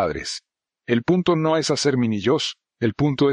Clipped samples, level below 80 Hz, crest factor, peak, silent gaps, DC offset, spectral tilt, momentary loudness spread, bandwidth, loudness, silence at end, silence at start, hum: under 0.1%; -52 dBFS; 14 dB; -6 dBFS; none; under 0.1%; -5.5 dB/octave; 10 LU; 10.5 kHz; -21 LUFS; 0 s; 0 s; none